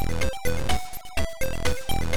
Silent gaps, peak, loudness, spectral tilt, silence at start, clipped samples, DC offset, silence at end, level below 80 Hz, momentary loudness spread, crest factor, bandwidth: none; -10 dBFS; -29 LUFS; -4 dB/octave; 0 s; under 0.1%; 6%; 0 s; -32 dBFS; 4 LU; 14 dB; over 20 kHz